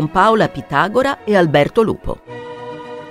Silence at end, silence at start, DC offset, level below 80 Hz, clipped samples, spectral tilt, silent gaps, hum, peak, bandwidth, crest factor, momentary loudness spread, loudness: 0 s; 0 s; under 0.1%; -40 dBFS; under 0.1%; -6.5 dB/octave; none; none; 0 dBFS; 15.5 kHz; 16 dB; 17 LU; -15 LUFS